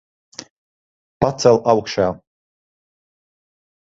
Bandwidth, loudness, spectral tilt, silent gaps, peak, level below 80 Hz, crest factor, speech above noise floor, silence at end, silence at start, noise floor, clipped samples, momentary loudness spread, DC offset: 8 kHz; -17 LUFS; -5.5 dB/octave; 0.50-1.20 s; 0 dBFS; -52 dBFS; 22 dB; over 74 dB; 1.7 s; 0.4 s; under -90 dBFS; under 0.1%; 23 LU; under 0.1%